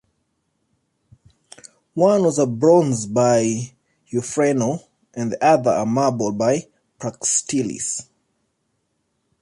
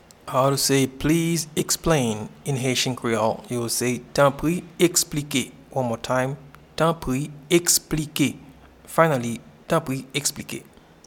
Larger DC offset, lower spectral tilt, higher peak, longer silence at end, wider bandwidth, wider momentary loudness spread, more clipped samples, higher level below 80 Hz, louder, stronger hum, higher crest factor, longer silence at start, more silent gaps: neither; about the same, -5 dB/octave vs -4 dB/octave; about the same, -2 dBFS vs -2 dBFS; first, 1.4 s vs 0.45 s; second, 11.5 kHz vs 19 kHz; first, 13 LU vs 10 LU; neither; second, -62 dBFS vs -48 dBFS; first, -19 LUFS vs -23 LUFS; neither; about the same, 18 dB vs 22 dB; first, 1.95 s vs 0.25 s; neither